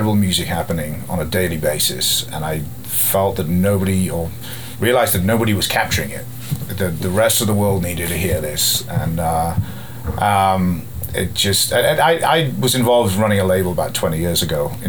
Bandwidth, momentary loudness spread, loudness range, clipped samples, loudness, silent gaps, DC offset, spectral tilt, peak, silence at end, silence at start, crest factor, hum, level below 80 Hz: over 20 kHz; 10 LU; 3 LU; under 0.1%; -17 LUFS; none; 2%; -4 dB/octave; -2 dBFS; 0 s; 0 s; 16 dB; none; -38 dBFS